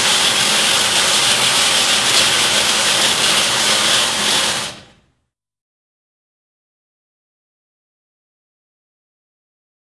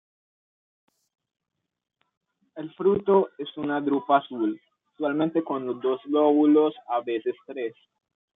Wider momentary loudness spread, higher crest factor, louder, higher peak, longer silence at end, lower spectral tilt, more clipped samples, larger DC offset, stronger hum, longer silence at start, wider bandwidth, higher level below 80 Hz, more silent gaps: second, 3 LU vs 14 LU; about the same, 18 dB vs 20 dB; first, -12 LUFS vs -25 LUFS; first, 0 dBFS vs -8 dBFS; first, 5.2 s vs 0.65 s; second, 0.5 dB/octave vs -9.5 dB/octave; neither; neither; neither; second, 0 s vs 2.55 s; first, 12 kHz vs 3.9 kHz; first, -52 dBFS vs -76 dBFS; neither